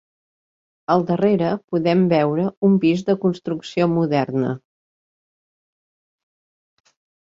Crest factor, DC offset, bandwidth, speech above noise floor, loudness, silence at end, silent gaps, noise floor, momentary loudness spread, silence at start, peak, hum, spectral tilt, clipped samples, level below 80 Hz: 18 dB; under 0.1%; 7.6 kHz; over 72 dB; -19 LUFS; 2.65 s; 1.64-1.68 s, 2.57-2.62 s; under -90 dBFS; 9 LU; 0.9 s; -4 dBFS; none; -8 dB/octave; under 0.1%; -62 dBFS